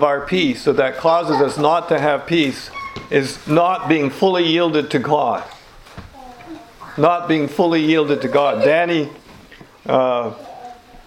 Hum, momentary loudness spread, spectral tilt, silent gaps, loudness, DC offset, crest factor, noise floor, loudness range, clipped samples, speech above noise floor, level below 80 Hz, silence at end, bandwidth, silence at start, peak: none; 17 LU; -6 dB/octave; none; -17 LUFS; under 0.1%; 18 dB; -43 dBFS; 2 LU; under 0.1%; 26 dB; -52 dBFS; 0.1 s; 15 kHz; 0 s; 0 dBFS